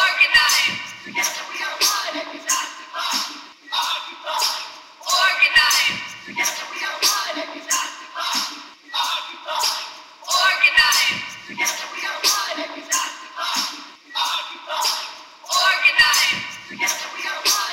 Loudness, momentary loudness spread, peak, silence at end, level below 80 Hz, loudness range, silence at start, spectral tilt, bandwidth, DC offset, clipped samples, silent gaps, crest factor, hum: -19 LUFS; 15 LU; -2 dBFS; 0 s; -58 dBFS; 5 LU; 0 s; 1.5 dB/octave; 16 kHz; under 0.1%; under 0.1%; none; 20 dB; none